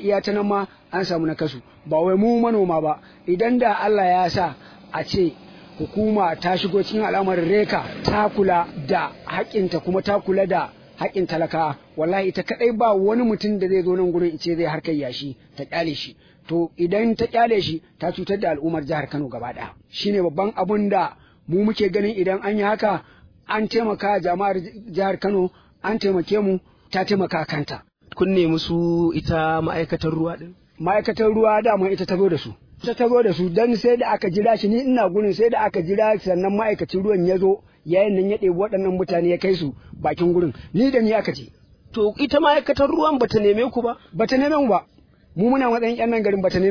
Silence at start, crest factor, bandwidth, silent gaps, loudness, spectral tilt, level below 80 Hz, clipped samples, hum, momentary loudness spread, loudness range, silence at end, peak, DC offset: 0 s; 18 dB; 5.4 kHz; none; -21 LUFS; -7.5 dB/octave; -50 dBFS; under 0.1%; none; 9 LU; 4 LU; 0 s; -2 dBFS; under 0.1%